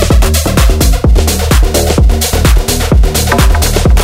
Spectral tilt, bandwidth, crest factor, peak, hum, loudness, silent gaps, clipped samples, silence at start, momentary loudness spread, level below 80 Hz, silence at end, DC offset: -4.5 dB/octave; 16.5 kHz; 8 dB; 0 dBFS; none; -10 LUFS; none; under 0.1%; 0 s; 1 LU; -10 dBFS; 0 s; under 0.1%